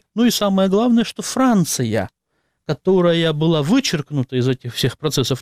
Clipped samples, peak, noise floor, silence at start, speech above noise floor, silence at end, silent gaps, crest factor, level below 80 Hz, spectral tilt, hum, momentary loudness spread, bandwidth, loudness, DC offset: under 0.1%; -6 dBFS; -70 dBFS; 0.15 s; 53 dB; 0 s; none; 12 dB; -52 dBFS; -5 dB/octave; none; 7 LU; 16 kHz; -18 LUFS; under 0.1%